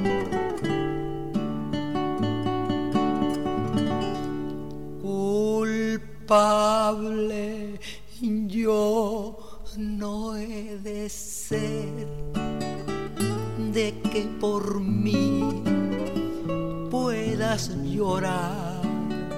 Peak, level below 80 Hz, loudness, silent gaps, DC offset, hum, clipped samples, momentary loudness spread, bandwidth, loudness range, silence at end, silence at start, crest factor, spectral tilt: -8 dBFS; -46 dBFS; -27 LUFS; none; 1%; none; under 0.1%; 10 LU; 16 kHz; 6 LU; 0 s; 0 s; 18 dB; -6 dB/octave